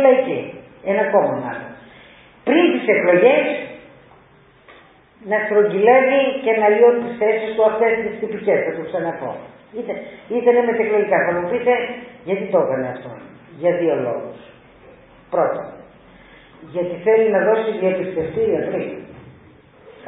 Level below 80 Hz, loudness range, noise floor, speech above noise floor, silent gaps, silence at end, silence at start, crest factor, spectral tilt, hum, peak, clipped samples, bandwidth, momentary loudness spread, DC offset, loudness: -58 dBFS; 7 LU; -50 dBFS; 33 dB; none; 0 s; 0 s; 18 dB; -10.5 dB/octave; none; -2 dBFS; under 0.1%; 4 kHz; 17 LU; under 0.1%; -18 LUFS